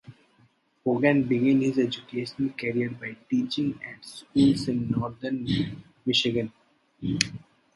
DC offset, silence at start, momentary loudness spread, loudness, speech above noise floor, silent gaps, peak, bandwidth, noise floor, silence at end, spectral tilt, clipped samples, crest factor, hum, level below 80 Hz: under 0.1%; 0.1 s; 12 LU; -26 LUFS; 38 dB; none; 0 dBFS; 11.5 kHz; -64 dBFS; 0.4 s; -5.5 dB/octave; under 0.1%; 26 dB; none; -56 dBFS